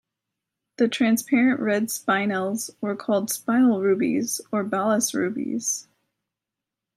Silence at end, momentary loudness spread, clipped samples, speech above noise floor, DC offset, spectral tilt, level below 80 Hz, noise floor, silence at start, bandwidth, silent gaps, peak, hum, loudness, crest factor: 1.15 s; 7 LU; under 0.1%; 64 dB; under 0.1%; -4 dB/octave; -76 dBFS; -87 dBFS; 0.8 s; 16 kHz; none; -8 dBFS; none; -23 LUFS; 16 dB